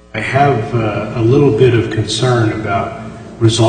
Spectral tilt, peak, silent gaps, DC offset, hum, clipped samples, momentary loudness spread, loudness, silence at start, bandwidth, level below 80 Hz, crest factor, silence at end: -6 dB/octave; 0 dBFS; none; under 0.1%; none; under 0.1%; 8 LU; -14 LUFS; 0.15 s; 9.4 kHz; -40 dBFS; 14 dB; 0 s